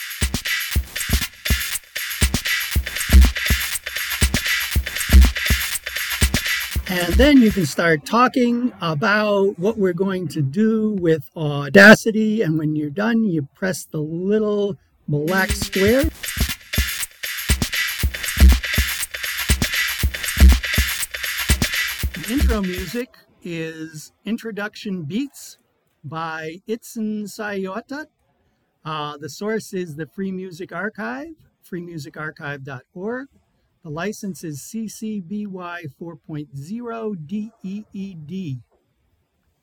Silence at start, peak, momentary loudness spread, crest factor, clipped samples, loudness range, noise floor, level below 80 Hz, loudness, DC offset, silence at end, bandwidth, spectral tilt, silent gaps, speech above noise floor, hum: 0 s; 0 dBFS; 17 LU; 20 dB; under 0.1%; 15 LU; -66 dBFS; -26 dBFS; -20 LUFS; under 0.1%; 1 s; 19.5 kHz; -4.5 dB/octave; none; 46 dB; none